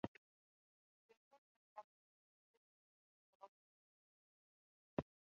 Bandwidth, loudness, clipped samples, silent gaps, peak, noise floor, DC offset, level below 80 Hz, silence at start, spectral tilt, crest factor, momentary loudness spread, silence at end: 6.6 kHz; -53 LUFS; under 0.1%; 0.08-1.09 s, 1.17-1.31 s, 1.38-1.76 s, 1.84-3.40 s, 3.49-4.97 s; -26 dBFS; under -90 dBFS; under 0.1%; -78 dBFS; 0.05 s; -7 dB/octave; 32 dB; 16 LU; 0.35 s